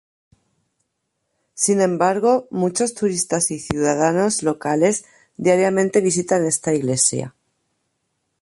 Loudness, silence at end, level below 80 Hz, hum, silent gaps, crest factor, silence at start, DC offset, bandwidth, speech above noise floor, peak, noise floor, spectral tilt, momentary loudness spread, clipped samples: -19 LUFS; 1.1 s; -56 dBFS; none; none; 20 dB; 1.55 s; under 0.1%; 12 kHz; 56 dB; 0 dBFS; -75 dBFS; -4.5 dB/octave; 5 LU; under 0.1%